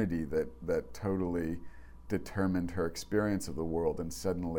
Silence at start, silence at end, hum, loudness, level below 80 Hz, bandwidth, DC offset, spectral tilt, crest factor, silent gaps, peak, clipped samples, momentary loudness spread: 0 s; 0 s; none; -34 LUFS; -50 dBFS; 17.5 kHz; under 0.1%; -6.5 dB/octave; 16 dB; none; -18 dBFS; under 0.1%; 5 LU